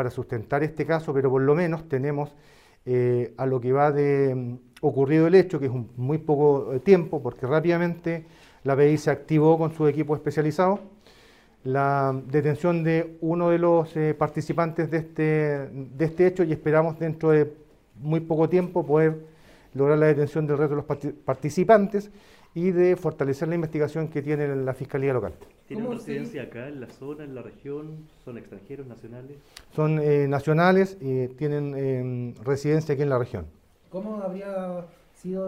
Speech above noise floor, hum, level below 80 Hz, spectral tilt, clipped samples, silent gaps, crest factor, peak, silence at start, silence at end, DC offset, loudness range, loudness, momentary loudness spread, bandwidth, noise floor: 31 dB; none; -58 dBFS; -8.5 dB/octave; under 0.1%; none; 20 dB; -4 dBFS; 0 s; 0 s; under 0.1%; 7 LU; -24 LUFS; 17 LU; 13 kHz; -55 dBFS